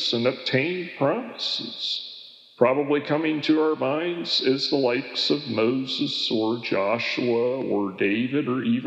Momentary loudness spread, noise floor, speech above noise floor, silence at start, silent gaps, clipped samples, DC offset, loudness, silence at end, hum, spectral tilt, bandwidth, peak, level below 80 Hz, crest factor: 5 LU; -45 dBFS; 21 dB; 0 s; none; under 0.1%; under 0.1%; -24 LUFS; 0 s; none; -5.5 dB/octave; 8.2 kHz; -4 dBFS; -86 dBFS; 20 dB